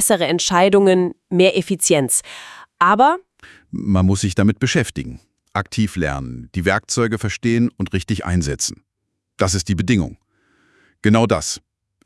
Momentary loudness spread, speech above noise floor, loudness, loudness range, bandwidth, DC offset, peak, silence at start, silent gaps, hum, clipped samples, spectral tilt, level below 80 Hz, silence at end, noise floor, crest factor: 13 LU; 58 dB; -18 LUFS; 5 LU; 12 kHz; under 0.1%; 0 dBFS; 0 s; none; none; under 0.1%; -4.5 dB/octave; -44 dBFS; 0.45 s; -76 dBFS; 18 dB